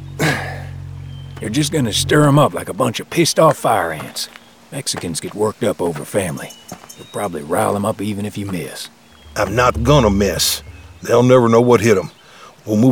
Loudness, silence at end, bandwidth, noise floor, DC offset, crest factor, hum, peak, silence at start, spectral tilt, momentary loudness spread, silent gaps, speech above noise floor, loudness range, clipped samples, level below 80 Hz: -16 LUFS; 0 s; over 20 kHz; -42 dBFS; 0.1%; 16 dB; none; 0 dBFS; 0 s; -5 dB/octave; 19 LU; none; 26 dB; 8 LU; under 0.1%; -38 dBFS